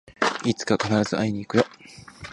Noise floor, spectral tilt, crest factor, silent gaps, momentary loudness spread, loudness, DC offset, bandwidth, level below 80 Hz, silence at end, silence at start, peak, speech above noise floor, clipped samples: -43 dBFS; -5 dB/octave; 22 dB; none; 19 LU; -24 LUFS; under 0.1%; 11.5 kHz; -56 dBFS; 0 s; 0.1 s; -4 dBFS; 20 dB; under 0.1%